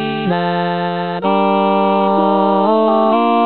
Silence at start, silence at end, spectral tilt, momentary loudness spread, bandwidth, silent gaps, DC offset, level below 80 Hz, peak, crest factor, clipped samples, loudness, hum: 0 s; 0 s; -10.5 dB/octave; 5 LU; 4.6 kHz; none; 0.7%; -64 dBFS; -2 dBFS; 12 dB; under 0.1%; -14 LUFS; none